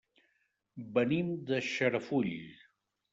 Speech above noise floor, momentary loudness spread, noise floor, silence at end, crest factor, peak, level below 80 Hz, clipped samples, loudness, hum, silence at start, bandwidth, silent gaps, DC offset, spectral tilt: 45 dB; 19 LU; -78 dBFS; 0.55 s; 20 dB; -16 dBFS; -74 dBFS; under 0.1%; -33 LUFS; none; 0.75 s; 7.8 kHz; none; under 0.1%; -6 dB/octave